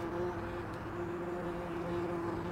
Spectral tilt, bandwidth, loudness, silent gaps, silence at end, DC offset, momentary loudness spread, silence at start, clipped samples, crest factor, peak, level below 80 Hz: -7.5 dB/octave; 15.5 kHz; -39 LUFS; none; 0 s; under 0.1%; 4 LU; 0 s; under 0.1%; 14 dB; -24 dBFS; -54 dBFS